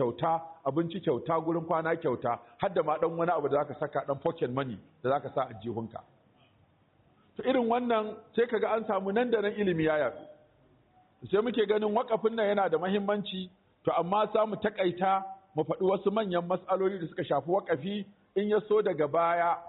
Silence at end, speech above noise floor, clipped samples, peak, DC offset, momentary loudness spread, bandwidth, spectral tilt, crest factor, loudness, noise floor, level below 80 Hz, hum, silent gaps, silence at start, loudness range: 0 s; 36 dB; under 0.1%; -16 dBFS; under 0.1%; 8 LU; 4.1 kHz; -5 dB/octave; 14 dB; -30 LUFS; -66 dBFS; -70 dBFS; none; none; 0 s; 4 LU